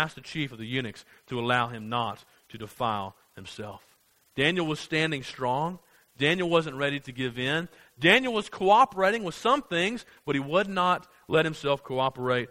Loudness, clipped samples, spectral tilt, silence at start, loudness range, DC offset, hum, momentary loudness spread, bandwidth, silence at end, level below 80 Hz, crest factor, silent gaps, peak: -27 LUFS; under 0.1%; -5 dB/octave; 0 s; 7 LU; under 0.1%; none; 18 LU; 16 kHz; 0.05 s; -62 dBFS; 22 dB; none; -4 dBFS